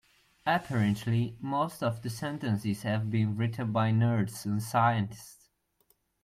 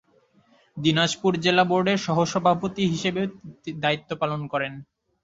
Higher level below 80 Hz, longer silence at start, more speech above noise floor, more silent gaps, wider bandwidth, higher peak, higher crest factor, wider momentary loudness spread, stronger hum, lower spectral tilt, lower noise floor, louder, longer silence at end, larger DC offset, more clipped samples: about the same, -64 dBFS vs -62 dBFS; second, 0.45 s vs 0.75 s; first, 42 dB vs 37 dB; neither; first, 15 kHz vs 7.8 kHz; second, -12 dBFS vs -4 dBFS; about the same, 18 dB vs 20 dB; second, 9 LU vs 12 LU; neither; first, -6.5 dB/octave vs -5 dB/octave; first, -71 dBFS vs -61 dBFS; second, -30 LUFS vs -23 LUFS; first, 0.9 s vs 0.4 s; neither; neither